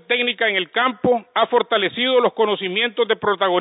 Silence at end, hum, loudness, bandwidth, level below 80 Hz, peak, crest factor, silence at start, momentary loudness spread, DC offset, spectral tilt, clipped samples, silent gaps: 0 s; none; -19 LUFS; 4 kHz; -62 dBFS; -4 dBFS; 16 dB; 0.1 s; 3 LU; under 0.1%; -9 dB/octave; under 0.1%; none